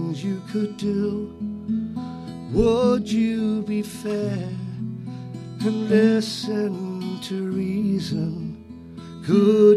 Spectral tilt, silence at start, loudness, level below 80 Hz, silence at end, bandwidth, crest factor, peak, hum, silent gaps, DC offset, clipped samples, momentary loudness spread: -7 dB/octave; 0 s; -24 LUFS; -46 dBFS; 0 s; 12.5 kHz; 18 dB; -4 dBFS; none; none; under 0.1%; under 0.1%; 16 LU